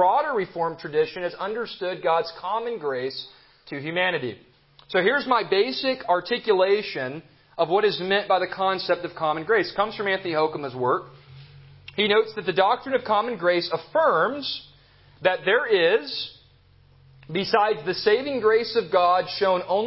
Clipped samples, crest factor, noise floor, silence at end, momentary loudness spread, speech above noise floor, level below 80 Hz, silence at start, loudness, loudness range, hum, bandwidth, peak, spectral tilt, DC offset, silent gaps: under 0.1%; 18 dB; -56 dBFS; 0 s; 9 LU; 33 dB; -64 dBFS; 0 s; -23 LUFS; 4 LU; none; 5.8 kHz; -6 dBFS; -8.5 dB/octave; under 0.1%; none